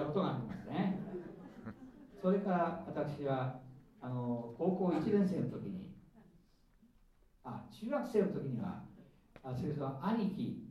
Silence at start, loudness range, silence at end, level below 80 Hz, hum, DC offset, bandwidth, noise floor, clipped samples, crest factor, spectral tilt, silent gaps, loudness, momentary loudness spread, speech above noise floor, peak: 0 s; 5 LU; 0 s; -68 dBFS; none; under 0.1%; 11 kHz; -67 dBFS; under 0.1%; 18 dB; -9 dB/octave; none; -38 LUFS; 18 LU; 31 dB; -20 dBFS